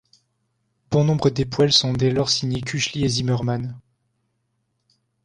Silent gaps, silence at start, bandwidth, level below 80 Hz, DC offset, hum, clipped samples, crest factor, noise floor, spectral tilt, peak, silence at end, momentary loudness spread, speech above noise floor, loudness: none; 0.9 s; 10.5 kHz; -50 dBFS; under 0.1%; none; under 0.1%; 18 dB; -72 dBFS; -5 dB/octave; -4 dBFS; 1.45 s; 9 LU; 52 dB; -20 LUFS